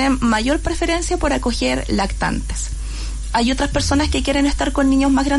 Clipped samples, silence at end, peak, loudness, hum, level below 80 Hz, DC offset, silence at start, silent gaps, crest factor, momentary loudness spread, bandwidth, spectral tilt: under 0.1%; 0 s; -6 dBFS; -19 LUFS; none; -26 dBFS; under 0.1%; 0 s; none; 12 dB; 9 LU; 11.5 kHz; -4.5 dB/octave